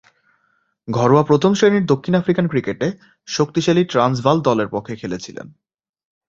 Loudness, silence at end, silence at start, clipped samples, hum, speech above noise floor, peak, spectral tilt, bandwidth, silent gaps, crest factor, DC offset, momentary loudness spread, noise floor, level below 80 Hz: -18 LUFS; 0.8 s; 0.85 s; under 0.1%; none; 48 dB; -2 dBFS; -6.5 dB/octave; 7.8 kHz; none; 18 dB; under 0.1%; 14 LU; -65 dBFS; -54 dBFS